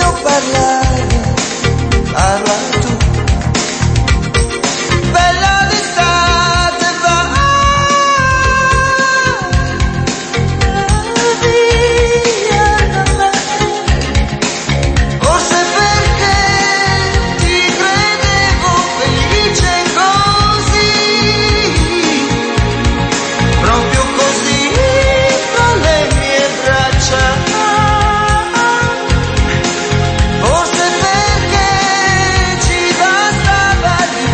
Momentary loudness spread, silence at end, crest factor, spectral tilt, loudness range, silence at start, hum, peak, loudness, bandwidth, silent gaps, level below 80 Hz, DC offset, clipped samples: 4 LU; 0 s; 10 dB; -4 dB/octave; 2 LU; 0 s; none; 0 dBFS; -11 LUFS; 8.8 kHz; none; -20 dBFS; under 0.1%; under 0.1%